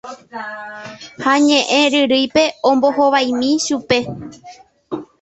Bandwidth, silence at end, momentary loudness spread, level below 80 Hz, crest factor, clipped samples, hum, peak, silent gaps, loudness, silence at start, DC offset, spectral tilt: 8.2 kHz; 0.2 s; 19 LU; -56 dBFS; 16 dB; under 0.1%; none; -2 dBFS; none; -15 LUFS; 0.05 s; under 0.1%; -3 dB/octave